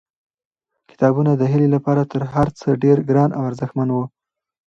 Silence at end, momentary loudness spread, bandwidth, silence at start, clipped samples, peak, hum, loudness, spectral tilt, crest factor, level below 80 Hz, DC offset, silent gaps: 0.6 s; 8 LU; 7.2 kHz; 1 s; under 0.1%; -2 dBFS; none; -18 LUFS; -9.5 dB/octave; 18 dB; -48 dBFS; under 0.1%; none